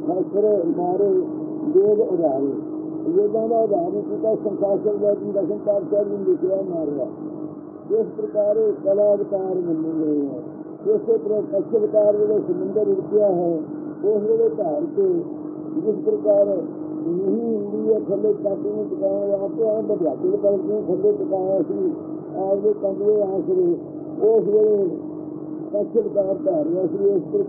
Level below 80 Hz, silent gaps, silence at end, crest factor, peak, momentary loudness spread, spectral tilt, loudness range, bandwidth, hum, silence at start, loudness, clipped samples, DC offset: -74 dBFS; none; 0 s; 14 dB; -6 dBFS; 9 LU; -15.5 dB/octave; 2 LU; 1.8 kHz; none; 0 s; -21 LUFS; under 0.1%; under 0.1%